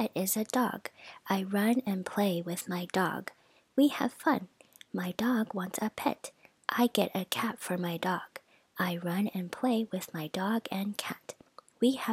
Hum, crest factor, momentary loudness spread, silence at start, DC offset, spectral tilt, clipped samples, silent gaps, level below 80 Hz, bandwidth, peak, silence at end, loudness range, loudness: none; 20 dB; 14 LU; 0 s; under 0.1%; -4.5 dB/octave; under 0.1%; none; -76 dBFS; 17 kHz; -12 dBFS; 0 s; 3 LU; -32 LUFS